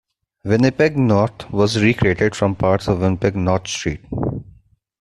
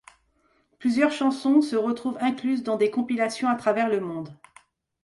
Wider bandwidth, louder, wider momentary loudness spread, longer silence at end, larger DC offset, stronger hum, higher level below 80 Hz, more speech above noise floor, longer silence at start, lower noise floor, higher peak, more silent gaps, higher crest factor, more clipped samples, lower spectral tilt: about the same, 12 kHz vs 11.5 kHz; first, -18 LUFS vs -24 LUFS; about the same, 9 LU vs 7 LU; about the same, 0.6 s vs 0.7 s; neither; neither; first, -42 dBFS vs -70 dBFS; second, 35 dB vs 43 dB; second, 0.45 s vs 0.8 s; second, -52 dBFS vs -67 dBFS; first, -2 dBFS vs -6 dBFS; neither; about the same, 16 dB vs 18 dB; neither; about the same, -6 dB/octave vs -5.5 dB/octave